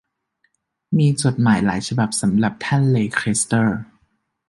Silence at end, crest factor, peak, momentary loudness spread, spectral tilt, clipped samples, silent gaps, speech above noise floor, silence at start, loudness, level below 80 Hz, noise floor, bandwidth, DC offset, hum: 0.65 s; 18 dB; -2 dBFS; 4 LU; -5.5 dB/octave; under 0.1%; none; 50 dB; 0.9 s; -19 LUFS; -50 dBFS; -68 dBFS; 11.5 kHz; under 0.1%; none